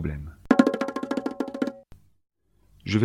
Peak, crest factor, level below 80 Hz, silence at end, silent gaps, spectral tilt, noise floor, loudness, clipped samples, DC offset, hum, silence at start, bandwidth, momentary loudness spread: -2 dBFS; 24 dB; -46 dBFS; 0 s; none; -7 dB/octave; -61 dBFS; -26 LUFS; under 0.1%; under 0.1%; none; 0 s; 12 kHz; 14 LU